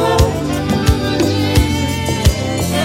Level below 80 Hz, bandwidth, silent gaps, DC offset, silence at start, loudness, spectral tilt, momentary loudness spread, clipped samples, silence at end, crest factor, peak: -22 dBFS; 16.5 kHz; none; under 0.1%; 0 s; -15 LUFS; -5.5 dB/octave; 4 LU; under 0.1%; 0 s; 14 dB; 0 dBFS